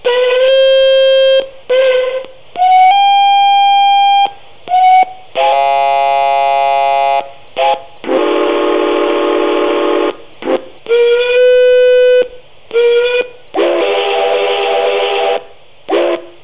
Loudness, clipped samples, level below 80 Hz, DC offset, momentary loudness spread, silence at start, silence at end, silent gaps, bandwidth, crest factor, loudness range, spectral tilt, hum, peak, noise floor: -11 LUFS; under 0.1%; -54 dBFS; 2%; 10 LU; 0.05 s; 0.15 s; none; 4 kHz; 10 dB; 4 LU; -6.5 dB/octave; none; 0 dBFS; -37 dBFS